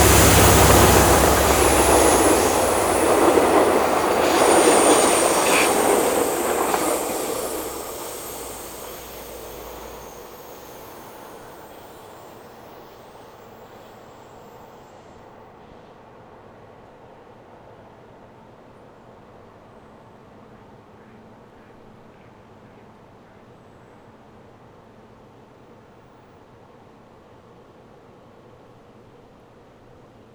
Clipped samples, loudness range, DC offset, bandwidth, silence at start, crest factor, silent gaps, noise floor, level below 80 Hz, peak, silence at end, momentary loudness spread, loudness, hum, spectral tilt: under 0.1%; 26 LU; under 0.1%; over 20 kHz; 0 s; 22 dB; none; -49 dBFS; -36 dBFS; -2 dBFS; 16.7 s; 27 LU; -17 LUFS; none; -3.5 dB/octave